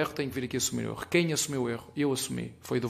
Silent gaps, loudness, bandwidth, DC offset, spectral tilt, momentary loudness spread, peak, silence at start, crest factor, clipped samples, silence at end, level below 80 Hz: none; -30 LUFS; 15.5 kHz; under 0.1%; -4 dB/octave; 7 LU; -10 dBFS; 0 s; 20 dB; under 0.1%; 0 s; -60 dBFS